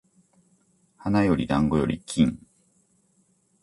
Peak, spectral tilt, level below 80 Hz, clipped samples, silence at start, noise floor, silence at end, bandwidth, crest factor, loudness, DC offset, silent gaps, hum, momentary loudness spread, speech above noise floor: -8 dBFS; -6.5 dB/octave; -46 dBFS; under 0.1%; 1 s; -66 dBFS; 1.25 s; 11.5 kHz; 20 dB; -24 LUFS; under 0.1%; none; none; 8 LU; 43 dB